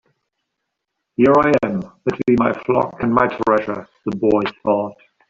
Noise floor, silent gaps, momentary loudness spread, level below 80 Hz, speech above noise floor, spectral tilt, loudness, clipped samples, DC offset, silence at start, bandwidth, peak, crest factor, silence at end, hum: -78 dBFS; none; 13 LU; -52 dBFS; 60 dB; -8 dB/octave; -18 LUFS; under 0.1%; under 0.1%; 1.2 s; 7.6 kHz; -2 dBFS; 16 dB; 0.35 s; none